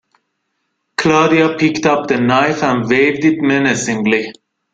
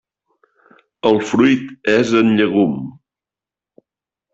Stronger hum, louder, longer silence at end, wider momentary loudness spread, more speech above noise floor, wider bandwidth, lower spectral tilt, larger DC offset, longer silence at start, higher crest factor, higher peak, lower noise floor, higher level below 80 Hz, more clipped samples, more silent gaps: neither; about the same, -14 LUFS vs -16 LUFS; second, 0.4 s vs 1.4 s; about the same, 5 LU vs 7 LU; second, 56 dB vs 74 dB; first, 9.2 kHz vs 8 kHz; about the same, -5 dB/octave vs -6 dB/octave; neither; about the same, 1 s vs 1.05 s; about the same, 14 dB vs 16 dB; about the same, 0 dBFS vs -2 dBFS; second, -70 dBFS vs -88 dBFS; first, -52 dBFS vs -58 dBFS; neither; neither